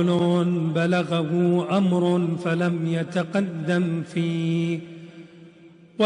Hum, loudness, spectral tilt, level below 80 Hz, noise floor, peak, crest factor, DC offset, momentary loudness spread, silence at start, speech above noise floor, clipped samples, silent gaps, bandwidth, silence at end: none; -23 LUFS; -7.5 dB/octave; -66 dBFS; -49 dBFS; -10 dBFS; 12 dB; under 0.1%; 7 LU; 0 s; 27 dB; under 0.1%; none; 10 kHz; 0 s